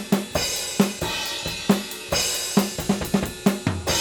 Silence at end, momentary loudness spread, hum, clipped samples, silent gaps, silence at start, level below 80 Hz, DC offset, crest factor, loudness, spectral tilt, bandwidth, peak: 0 s; 4 LU; none; under 0.1%; none; 0 s; -44 dBFS; under 0.1%; 22 dB; -23 LUFS; -3.5 dB/octave; over 20 kHz; -2 dBFS